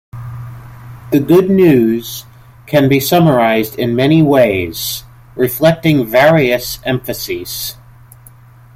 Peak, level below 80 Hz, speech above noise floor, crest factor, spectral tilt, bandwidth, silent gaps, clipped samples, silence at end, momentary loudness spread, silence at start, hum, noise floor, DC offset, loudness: 0 dBFS; -44 dBFS; 29 dB; 12 dB; -6 dB/octave; 16.5 kHz; none; under 0.1%; 1.05 s; 18 LU; 0.15 s; none; -40 dBFS; under 0.1%; -12 LUFS